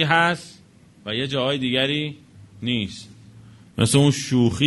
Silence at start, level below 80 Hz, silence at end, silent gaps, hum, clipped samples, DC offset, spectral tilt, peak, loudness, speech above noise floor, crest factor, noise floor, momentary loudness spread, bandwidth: 0 s; -52 dBFS; 0 s; none; none; under 0.1%; under 0.1%; -4.5 dB/octave; -2 dBFS; -22 LUFS; 30 dB; 20 dB; -51 dBFS; 17 LU; 11.5 kHz